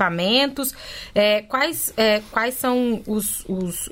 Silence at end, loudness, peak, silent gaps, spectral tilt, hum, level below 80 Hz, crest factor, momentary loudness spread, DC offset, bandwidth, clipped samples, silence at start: 0 s; -21 LUFS; -4 dBFS; none; -3 dB/octave; none; -48 dBFS; 18 dB; 8 LU; under 0.1%; 16.5 kHz; under 0.1%; 0 s